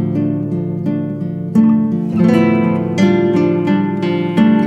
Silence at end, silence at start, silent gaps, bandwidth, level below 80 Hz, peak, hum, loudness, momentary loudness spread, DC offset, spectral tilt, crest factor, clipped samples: 0 s; 0 s; none; 7.8 kHz; -52 dBFS; 0 dBFS; none; -15 LUFS; 7 LU; under 0.1%; -8.5 dB/octave; 12 dB; under 0.1%